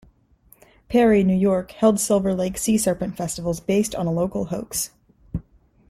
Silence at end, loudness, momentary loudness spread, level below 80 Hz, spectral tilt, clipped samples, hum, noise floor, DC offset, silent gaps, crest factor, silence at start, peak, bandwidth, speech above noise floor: 0.5 s; -21 LUFS; 12 LU; -46 dBFS; -5.5 dB/octave; under 0.1%; none; -56 dBFS; under 0.1%; none; 16 dB; 0.9 s; -6 dBFS; 15.5 kHz; 36 dB